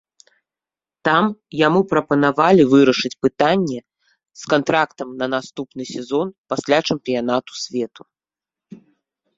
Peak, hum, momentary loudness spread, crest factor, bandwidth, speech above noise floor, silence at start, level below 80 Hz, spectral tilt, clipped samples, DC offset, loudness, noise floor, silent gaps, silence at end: 0 dBFS; none; 13 LU; 20 dB; 7.8 kHz; over 72 dB; 1.05 s; -60 dBFS; -5.5 dB/octave; under 0.1%; under 0.1%; -18 LUFS; under -90 dBFS; 6.38-6.44 s; 0.6 s